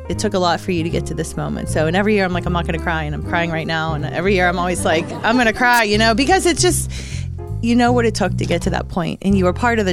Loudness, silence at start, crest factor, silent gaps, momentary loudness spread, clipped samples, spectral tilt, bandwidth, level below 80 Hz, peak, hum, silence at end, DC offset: -17 LUFS; 0 s; 16 dB; none; 9 LU; under 0.1%; -5 dB/octave; 16 kHz; -32 dBFS; -2 dBFS; none; 0 s; under 0.1%